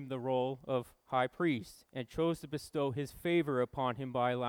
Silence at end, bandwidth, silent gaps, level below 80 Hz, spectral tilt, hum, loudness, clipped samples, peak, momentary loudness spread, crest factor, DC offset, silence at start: 0 s; 18.5 kHz; none; -64 dBFS; -6.5 dB/octave; none; -35 LUFS; under 0.1%; -18 dBFS; 7 LU; 16 dB; under 0.1%; 0 s